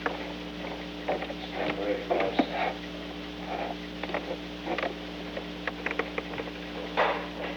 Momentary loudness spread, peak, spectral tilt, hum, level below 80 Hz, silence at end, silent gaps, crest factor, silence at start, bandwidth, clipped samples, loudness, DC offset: 9 LU; -10 dBFS; -5.5 dB/octave; 60 Hz at -50 dBFS; -52 dBFS; 0 s; none; 22 dB; 0 s; over 20 kHz; under 0.1%; -33 LUFS; under 0.1%